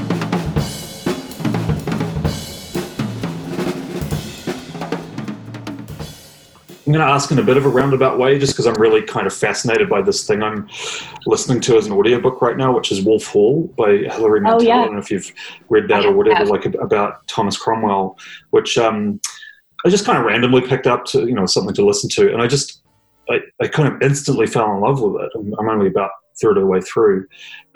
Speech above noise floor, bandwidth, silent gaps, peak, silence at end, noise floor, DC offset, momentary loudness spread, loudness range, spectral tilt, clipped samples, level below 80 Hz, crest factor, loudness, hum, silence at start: 28 dB; 18 kHz; none; -2 dBFS; 0.15 s; -44 dBFS; under 0.1%; 13 LU; 8 LU; -5 dB/octave; under 0.1%; -44 dBFS; 16 dB; -17 LUFS; none; 0 s